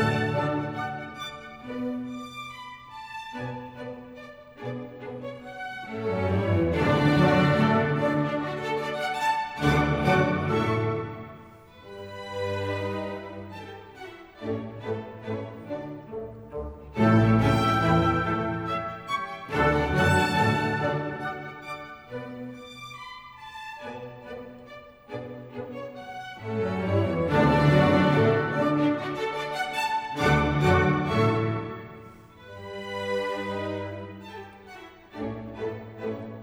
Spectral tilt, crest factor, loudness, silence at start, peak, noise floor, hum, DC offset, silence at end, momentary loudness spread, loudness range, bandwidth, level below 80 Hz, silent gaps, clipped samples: -7 dB/octave; 18 dB; -26 LUFS; 0 s; -8 dBFS; -48 dBFS; none; under 0.1%; 0 s; 20 LU; 14 LU; 16 kHz; -46 dBFS; none; under 0.1%